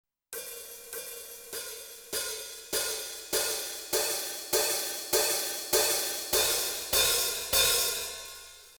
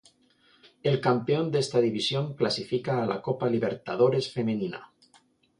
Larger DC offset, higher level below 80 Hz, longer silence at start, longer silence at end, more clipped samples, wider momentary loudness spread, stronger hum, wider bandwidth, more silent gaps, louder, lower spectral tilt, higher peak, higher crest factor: neither; first, -58 dBFS vs -68 dBFS; second, 0.3 s vs 0.85 s; second, 0 s vs 0.75 s; neither; first, 16 LU vs 6 LU; neither; first, over 20 kHz vs 11 kHz; neither; about the same, -28 LUFS vs -27 LUFS; second, 0.5 dB/octave vs -6 dB/octave; about the same, -12 dBFS vs -10 dBFS; about the same, 20 dB vs 18 dB